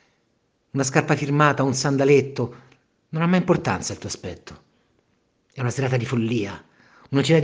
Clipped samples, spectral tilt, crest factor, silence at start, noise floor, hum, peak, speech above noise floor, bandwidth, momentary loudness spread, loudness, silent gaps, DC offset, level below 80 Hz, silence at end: under 0.1%; -5.5 dB/octave; 22 dB; 0.75 s; -68 dBFS; none; 0 dBFS; 47 dB; 10 kHz; 14 LU; -22 LUFS; none; under 0.1%; -58 dBFS; 0 s